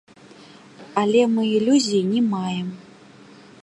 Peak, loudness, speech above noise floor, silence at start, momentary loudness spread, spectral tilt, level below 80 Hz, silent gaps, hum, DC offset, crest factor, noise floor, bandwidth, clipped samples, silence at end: -4 dBFS; -20 LUFS; 27 dB; 0.8 s; 11 LU; -5.5 dB/octave; -70 dBFS; none; none; under 0.1%; 18 dB; -46 dBFS; 11 kHz; under 0.1%; 0.8 s